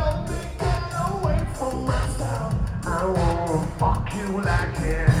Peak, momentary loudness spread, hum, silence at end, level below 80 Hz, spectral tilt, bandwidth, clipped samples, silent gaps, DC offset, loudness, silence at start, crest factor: -4 dBFS; 5 LU; none; 0 s; -30 dBFS; -6.5 dB/octave; 15 kHz; under 0.1%; none; under 0.1%; -25 LUFS; 0 s; 18 dB